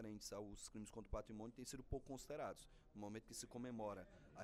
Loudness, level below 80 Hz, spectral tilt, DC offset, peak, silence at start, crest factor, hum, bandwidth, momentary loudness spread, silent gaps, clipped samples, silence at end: -53 LUFS; -64 dBFS; -4.5 dB/octave; under 0.1%; -32 dBFS; 0 s; 20 dB; none; 15.5 kHz; 7 LU; none; under 0.1%; 0 s